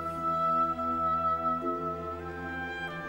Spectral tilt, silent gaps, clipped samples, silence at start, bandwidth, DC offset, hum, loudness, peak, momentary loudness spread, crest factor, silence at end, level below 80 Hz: -7 dB/octave; none; under 0.1%; 0 s; 16 kHz; under 0.1%; none; -30 LUFS; -20 dBFS; 10 LU; 12 dB; 0 s; -54 dBFS